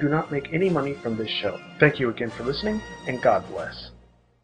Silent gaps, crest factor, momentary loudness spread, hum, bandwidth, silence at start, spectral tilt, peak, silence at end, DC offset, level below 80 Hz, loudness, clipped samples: none; 24 dB; 13 LU; none; 9.8 kHz; 0 s; -6.5 dB/octave; -2 dBFS; 0.45 s; under 0.1%; -52 dBFS; -25 LUFS; under 0.1%